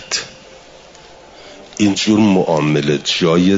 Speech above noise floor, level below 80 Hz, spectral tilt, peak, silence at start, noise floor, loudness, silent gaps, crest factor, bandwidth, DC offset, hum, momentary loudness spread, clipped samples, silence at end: 27 dB; -52 dBFS; -5 dB/octave; -2 dBFS; 0 s; -41 dBFS; -15 LUFS; none; 14 dB; 7.8 kHz; under 0.1%; none; 9 LU; under 0.1%; 0 s